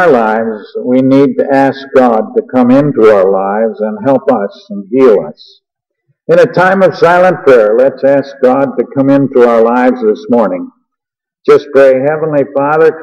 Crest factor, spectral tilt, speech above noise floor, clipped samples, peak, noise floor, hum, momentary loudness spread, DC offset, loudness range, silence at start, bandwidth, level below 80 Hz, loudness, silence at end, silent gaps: 8 dB; -8 dB/octave; 73 dB; 0.4%; 0 dBFS; -81 dBFS; none; 8 LU; under 0.1%; 3 LU; 0 s; 8.4 kHz; -54 dBFS; -9 LUFS; 0 s; none